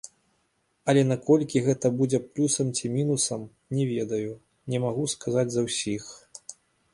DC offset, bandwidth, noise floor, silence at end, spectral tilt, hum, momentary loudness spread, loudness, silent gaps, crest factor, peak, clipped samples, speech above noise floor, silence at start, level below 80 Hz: under 0.1%; 11.5 kHz; -72 dBFS; 0.4 s; -5 dB/octave; none; 20 LU; -26 LUFS; none; 20 dB; -8 dBFS; under 0.1%; 46 dB; 0.85 s; -64 dBFS